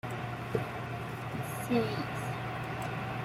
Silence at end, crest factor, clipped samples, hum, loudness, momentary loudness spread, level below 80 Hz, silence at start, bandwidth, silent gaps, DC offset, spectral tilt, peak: 0 s; 18 dB; under 0.1%; none; -36 LUFS; 7 LU; -58 dBFS; 0.05 s; 16 kHz; none; under 0.1%; -6 dB/octave; -16 dBFS